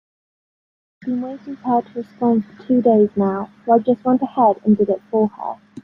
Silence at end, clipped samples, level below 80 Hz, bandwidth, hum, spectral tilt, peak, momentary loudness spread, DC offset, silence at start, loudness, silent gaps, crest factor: 0.05 s; under 0.1%; -62 dBFS; 4.3 kHz; none; -11 dB/octave; -2 dBFS; 14 LU; under 0.1%; 1.05 s; -18 LUFS; none; 16 dB